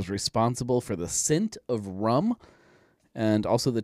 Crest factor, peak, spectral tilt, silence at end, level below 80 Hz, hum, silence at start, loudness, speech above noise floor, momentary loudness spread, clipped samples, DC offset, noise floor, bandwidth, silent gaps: 16 dB; -10 dBFS; -5 dB/octave; 0 s; -56 dBFS; none; 0 s; -27 LUFS; 35 dB; 8 LU; under 0.1%; under 0.1%; -61 dBFS; 15.5 kHz; none